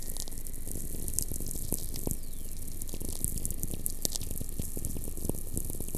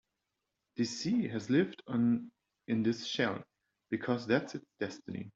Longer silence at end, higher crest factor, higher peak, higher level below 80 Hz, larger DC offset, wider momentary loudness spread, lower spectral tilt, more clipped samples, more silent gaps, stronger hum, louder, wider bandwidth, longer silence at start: about the same, 0 s vs 0.05 s; first, 28 dB vs 20 dB; first, -4 dBFS vs -16 dBFS; first, -38 dBFS vs -74 dBFS; neither; second, 7 LU vs 12 LU; second, -4 dB/octave vs -5.5 dB/octave; neither; neither; neither; about the same, -36 LUFS vs -34 LUFS; first, 15 kHz vs 7.8 kHz; second, 0 s vs 0.75 s